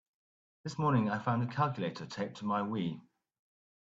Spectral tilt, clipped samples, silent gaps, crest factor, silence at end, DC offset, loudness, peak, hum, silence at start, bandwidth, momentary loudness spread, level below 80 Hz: -7 dB/octave; under 0.1%; none; 18 dB; 0.8 s; under 0.1%; -34 LUFS; -18 dBFS; none; 0.65 s; 8 kHz; 11 LU; -74 dBFS